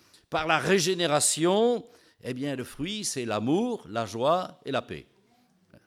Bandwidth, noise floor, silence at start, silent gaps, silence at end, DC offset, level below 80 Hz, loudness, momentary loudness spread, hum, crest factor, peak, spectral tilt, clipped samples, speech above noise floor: 16.5 kHz; -65 dBFS; 0.3 s; none; 0.85 s; under 0.1%; -62 dBFS; -27 LUFS; 11 LU; none; 20 dB; -8 dBFS; -3.5 dB/octave; under 0.1%; 38 dB